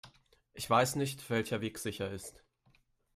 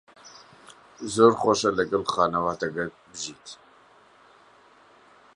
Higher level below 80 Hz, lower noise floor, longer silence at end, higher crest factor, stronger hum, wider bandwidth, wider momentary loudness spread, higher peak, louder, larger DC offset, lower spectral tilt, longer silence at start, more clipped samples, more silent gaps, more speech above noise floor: second, -66 dBFS vs -60 dBFS; first, -70 dBFS vs -56 dBFS; second, 0.85 s vs 1.8 s; about the same, 22 dB vs 24 dB; neither; first, 15.5 kHz vs 11 kHz; second, 15 LU vs 21 LU; second, -14 dBFS vs -4 dBFS; second, -34 LUFS vs -24 LUFS; neither; about the same, -4.5 dB/octave vs -4 dB/octave; second, 0.05 s vs 0.25 s; neither; neither; first, 37 dB vs 32 dB